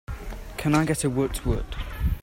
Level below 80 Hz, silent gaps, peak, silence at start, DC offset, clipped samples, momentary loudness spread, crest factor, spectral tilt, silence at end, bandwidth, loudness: -32 dBFS; none; -10 dBFS; 0.1 s; under 0.1%; under 0.1%; 15 LU; 16 dB; -5.5 dB/octave; 0 s; 16.5 kHz; -26 LUFS